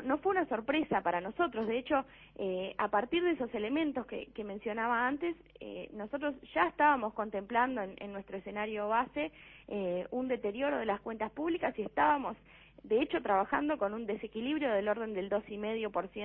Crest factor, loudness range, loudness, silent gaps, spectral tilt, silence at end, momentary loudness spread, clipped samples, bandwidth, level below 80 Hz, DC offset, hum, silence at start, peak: 20 dB; 3 LU; -34 LUFS; none; -3 dB/octave; 0 s; 11 LU; under 0.1%; 4.3 kHz; -64 dBFS; under 0.1%; none; 0 s; -14 dBFS